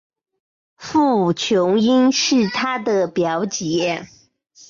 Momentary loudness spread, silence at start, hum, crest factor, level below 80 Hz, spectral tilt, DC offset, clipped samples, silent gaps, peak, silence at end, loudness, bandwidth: 7 LU; 0.8 s; none; 12 dB; -60 dBFS; -4.5 dB/octave; under 0.1%; under 0.1%; none; -6 dBFS; 0.65 s; -18 LUFS; 7.6 kHz